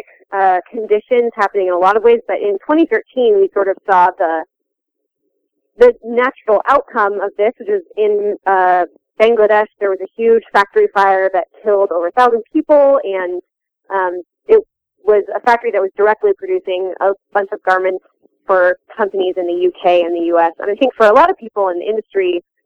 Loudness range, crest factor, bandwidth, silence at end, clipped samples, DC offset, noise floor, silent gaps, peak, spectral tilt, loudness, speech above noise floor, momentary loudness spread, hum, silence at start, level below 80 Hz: 3 LU; 14 dB; 8 kHz; 0.25 s; under 0.1%; under 0.1%; -76 dBFS; none; 0 dBFS; -5.5 dB/octave; -14 LUFS; 62 dB; 8 LU; none; 0.3 s; -54 dBFS